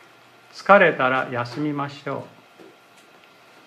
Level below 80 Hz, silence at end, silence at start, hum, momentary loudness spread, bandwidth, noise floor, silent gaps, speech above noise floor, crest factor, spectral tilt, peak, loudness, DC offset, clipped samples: -72 dBFS; 1.4 s; 0.55 s; none; 17 LU; 11 kHz; -51 dBFS; none; 31 dB; 24 dB; -6 dB/octave; 0 dBFS; -20 LUFS; under 0.1%; under 0.1%